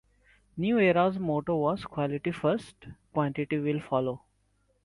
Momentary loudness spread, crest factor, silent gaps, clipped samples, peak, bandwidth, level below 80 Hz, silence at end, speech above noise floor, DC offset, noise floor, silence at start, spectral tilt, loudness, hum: 11 LU; 18 dB; none; under 0.1%; -12 dBFS; 11.5 kHz; -62 dBFS; 0.65 s; 42 dB; under 0.1%; -70 dBFS; 0.55 s; -8 dB/octave; -29 LUFS; none